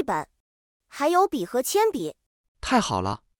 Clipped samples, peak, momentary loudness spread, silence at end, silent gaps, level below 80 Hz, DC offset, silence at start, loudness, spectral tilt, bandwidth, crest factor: under 0.1%; -8 dBFS; 14 LU; 0.25 s; 0.40-0.80 s, 2.26-2.55 s; -52 dBFS; under 0.1%; 0 s; -24 LUFS; -4 dB/octave; 18 kHz; 18 dB